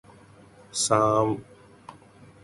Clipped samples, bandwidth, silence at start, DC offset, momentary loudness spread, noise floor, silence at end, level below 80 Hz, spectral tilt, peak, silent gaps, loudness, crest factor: under 0.1%; 11.5 kHz; 0.75 s; under 0.1%; 13 LU; -52 dBFS; 0.5 s; -60 dBFS; -4 dB/octave; -6 dBFS; none; -24 LUFS; 22 dB